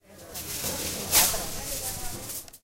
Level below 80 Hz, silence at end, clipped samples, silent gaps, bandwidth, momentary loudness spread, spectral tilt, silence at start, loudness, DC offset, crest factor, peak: -44 dBFS; 0.05 s; under 0.1%; none; 16 kHz; 16 LU; -1 dB/octave; 0.1 s; -26 LUFS; under 0.1%; 24 dB; -6 dBFS